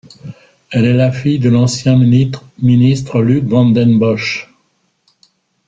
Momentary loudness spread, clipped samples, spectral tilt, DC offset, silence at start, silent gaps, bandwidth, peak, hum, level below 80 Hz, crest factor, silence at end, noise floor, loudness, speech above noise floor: 9 LU; under 0.1%; -7 dB/octave; under 0.1%; 0.25 s; none; 7.8 kHz; -2 dBFS; none; -48 dBFS; 12 dB; 1.25 s; -61 dBFS; -12 LUFS; 50 dB